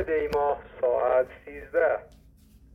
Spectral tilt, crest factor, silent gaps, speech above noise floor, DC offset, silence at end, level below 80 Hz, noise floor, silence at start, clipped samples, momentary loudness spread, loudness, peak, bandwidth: -6.5 dB/octave; 14 dB; none; 25 dB; under 0.1%; 0.7 s; -52 dBFS; -55 dBFS; 0 s; under 0.1%; 9 LU; -27 LUFS; -12 dBFS; 13.5 kHz